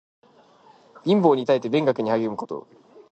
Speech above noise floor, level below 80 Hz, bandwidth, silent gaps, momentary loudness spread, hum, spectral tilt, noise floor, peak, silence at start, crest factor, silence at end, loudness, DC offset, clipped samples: 33 dB; -72 dBFS; 8.4 kHz; none; 14 LU; none; -7.5 dB/octave; -54 dBFS; -4 dBFS; 1.05 s; 20 dB; 0.55 s; -22 LUFS; under 0.1%; under 0.1%